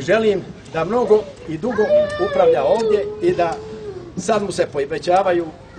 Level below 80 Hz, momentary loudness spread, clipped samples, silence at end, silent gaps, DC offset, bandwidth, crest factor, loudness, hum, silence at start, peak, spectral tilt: -48 dBFS; 12 LU; under 0.1%; 0 s; none; under 0.1%; 9.8 kHz; 16 dB; -18 LUFS; none; 0 s; -2 dBFS; -5.5 dB/octave